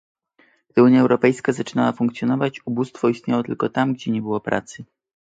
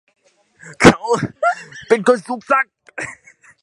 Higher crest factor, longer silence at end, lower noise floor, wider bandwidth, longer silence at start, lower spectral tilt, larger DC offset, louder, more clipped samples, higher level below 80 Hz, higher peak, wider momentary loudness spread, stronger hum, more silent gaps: about the same, 18 dB vs 18 dB; about the same, 0.4 s vs 0.5 s; first, -60 dBFS vs -48 dBFS; second, 8.6 kHz vs 12 kHz; about the same, 0.75 s vs 0.65 s; first, -7 dB/octave vs -5 dB/octave; neither; second, -20 LUFS vs -16 LUFS; second, under 0.1% vs 0.1%; second, -62 dBFS vs -44 dBFS; about the same, -2 dBFS vs 0 dBFS; second, 11 LU vs 17 LU; neither; neither